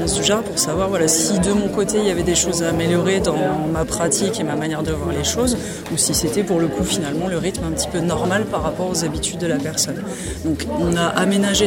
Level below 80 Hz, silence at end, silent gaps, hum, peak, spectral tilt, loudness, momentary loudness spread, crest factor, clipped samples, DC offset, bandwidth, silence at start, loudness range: -38 dBFS; 0 s; none; none; 0 dBFS; -4 dB/octave; -19 LUFS; 5 LU; 18 dB; under 0.1%; under 0.1%; 16.5 kHz; 0 s; 3 LU